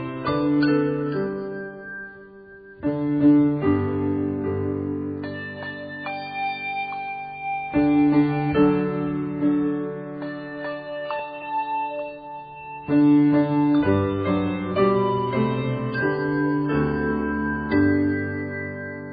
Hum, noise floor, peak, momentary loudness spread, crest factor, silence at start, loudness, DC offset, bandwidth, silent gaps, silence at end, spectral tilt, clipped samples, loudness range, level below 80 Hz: none; -44 dBFS; -8 dBFS; 14 LU; 16 dB; 0 s; -23 LUFS; under 0.1%; 5 kHz; none; 0 s; -6.5 dB/octave; under 0.1%; 7 LU; -50 dBFS